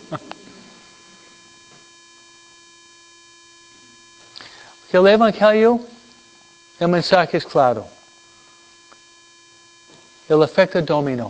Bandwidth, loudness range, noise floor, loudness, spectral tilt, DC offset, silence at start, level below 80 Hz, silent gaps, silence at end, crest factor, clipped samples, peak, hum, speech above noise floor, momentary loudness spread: 8 kHz; 6 LU; -49 dBFS; -16 LUFS; -6 dB/octave; under 0.1%; 0.1 s; -60 dBFS; none; 0 s; 20 dB; under 0.1%; 0 dBFS; none; 34 dB; 26 LU